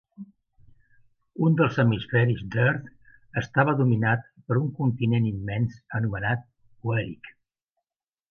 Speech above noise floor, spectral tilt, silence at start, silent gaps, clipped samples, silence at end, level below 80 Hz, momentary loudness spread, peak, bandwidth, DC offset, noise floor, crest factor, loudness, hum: over 66 dB; -8.5 dB/octave; 0.2 s; none; under 0.1%; 1 s; -54 dBFS; 11 LU; -8 dBFS; 6.6 kHz; under 0.1%; under -90 dBFS; 18 dB; -25 LUFS; none